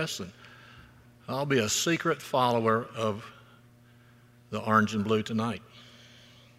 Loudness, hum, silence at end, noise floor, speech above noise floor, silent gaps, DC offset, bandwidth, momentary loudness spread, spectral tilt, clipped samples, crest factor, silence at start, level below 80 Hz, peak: -28 LUFS; none; 0.7 s; -57 dBFS; 29 dB; none; under 0.1%; 16 kHz; 16 LU; -4.5 dB/octave; under 0.1%; 24 dB; 0 s; -68 dBFS; -8 dBFS